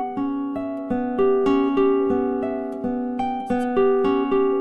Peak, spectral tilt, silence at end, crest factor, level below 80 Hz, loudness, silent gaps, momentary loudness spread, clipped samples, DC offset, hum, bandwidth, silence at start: -8 dBFS; -7.5 dB/octave; 0 s; 12 dB; -52 dBFS; -22 LUFS; none; 8 LU; under 0.1%; under 0.1%; none; 5.6 kHz; 0 s